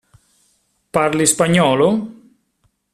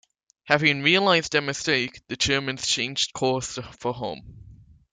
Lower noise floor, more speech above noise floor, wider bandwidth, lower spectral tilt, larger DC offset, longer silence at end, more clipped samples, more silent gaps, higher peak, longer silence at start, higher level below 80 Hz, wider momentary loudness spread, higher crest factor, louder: first, -65 dBFS vs -50 dBFS; first, 50 dB vs 25 dB; first, 15 kHz vs 9.6 kHz; about the same, -4 dB/octave vs -3 dB/octave; neither; first, 0.8 s vs 0.4 s; neither; neither; first, 0 dBFS vs -4 dBFS; first, 0.95 s vs 0.45 s; about the same, -54 dBFS vs -54 dBFS; second, 10 LU vs 13 LU; about the same, 18 dB vs 22 dB; first, -15 LUFS vs -23 LUFS